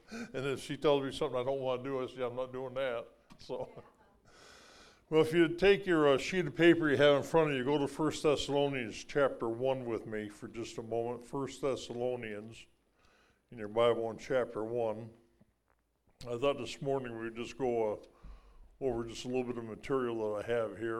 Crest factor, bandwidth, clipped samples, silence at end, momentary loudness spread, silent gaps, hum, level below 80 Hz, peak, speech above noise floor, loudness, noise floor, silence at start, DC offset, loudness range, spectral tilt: 20 dB; 13.5 kHz; under 0.1%; 0 s; 15 LU; none; none; -60 dBFS; -12 dBFS; 43 dB; -33 LUFS; -76 dBFS; 0.1 s; under 0.1%; 10 LU; -5.5 dB/octave